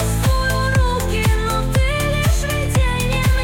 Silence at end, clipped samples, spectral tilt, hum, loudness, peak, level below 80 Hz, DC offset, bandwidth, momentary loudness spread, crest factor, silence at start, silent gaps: 0 s; under 0.1%; -5 dB/octave; none; -18 LUFS; -6 dBFS; -20 dBFS; under 0.1%; 17.5 kHz; 1 LU; 10 dB; 0 s; none